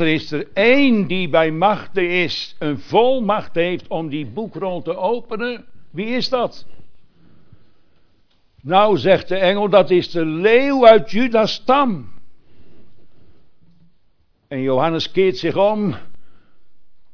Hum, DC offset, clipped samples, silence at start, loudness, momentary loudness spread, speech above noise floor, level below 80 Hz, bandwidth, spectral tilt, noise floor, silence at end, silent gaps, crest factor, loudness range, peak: none; under 0.1%; under 0.1%; 0 s; -17 LUFS; 12 LU; 42 dB; -54 dBFS; 5.4 kHz; -6.5 dB/octave; -59 dBFS; 0 s; none; 18 dB; 10 LU; 0 dBFS